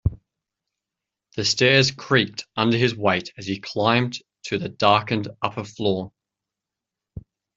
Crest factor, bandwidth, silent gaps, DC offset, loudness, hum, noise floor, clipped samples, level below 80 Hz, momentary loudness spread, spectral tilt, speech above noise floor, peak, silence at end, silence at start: 22 dB; 7.8 kHz; none; under 0.1%; -22 LUFS; none; -87 dBFS; under 0.1%; -48 dBFS; 12 LU; -4.5 dB/octave; 65 dB; -2 dBFS; 0.4 s; 0.05 s